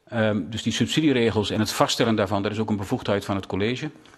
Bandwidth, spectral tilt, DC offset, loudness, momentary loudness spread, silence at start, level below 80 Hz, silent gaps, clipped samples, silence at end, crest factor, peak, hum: 13.5 kHz; -5 dB/octave; under 0.1%; -24 LUFS; 6 LU; 0.1 s; -56 dBFS; none; under 0.1%; 0.25 s; 20 dB; -2 dBFS; none